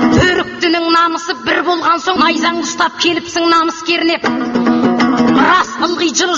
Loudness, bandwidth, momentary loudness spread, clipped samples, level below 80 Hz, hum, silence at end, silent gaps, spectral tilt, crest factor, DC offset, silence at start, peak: -13 LUFS; 7.8 kHz; 5 LU; under 0.1%; -40 dBFS; none; 0 s; none; -3.5 dB/octave; 12 dB; under 0.1%; 0 s; 0 dBFS